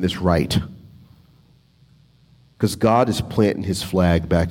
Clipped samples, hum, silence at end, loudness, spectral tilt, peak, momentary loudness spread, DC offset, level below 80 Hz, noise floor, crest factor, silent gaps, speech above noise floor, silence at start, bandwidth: under 0.1%; none; 0 s; -20 LUFS; -6 dB/octave; -4 dBFS; 7 LU; under 0.1%; -42 dBFS; -54 dBFS; 18 dB; none; 36 dB; 0 s; 16.5 kHz